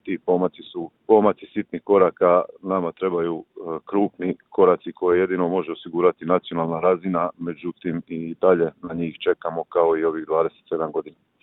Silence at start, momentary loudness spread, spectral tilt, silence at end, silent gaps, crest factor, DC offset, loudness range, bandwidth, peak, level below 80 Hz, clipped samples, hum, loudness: 0.05 s; 11 LU; -11 dB/octave; 0.35 s; none; 20 dB; under 0.1%; 2 LU; 4 kHz; -2 dBFS; -64 dBFS; under 0.1%; none; -22 LUFS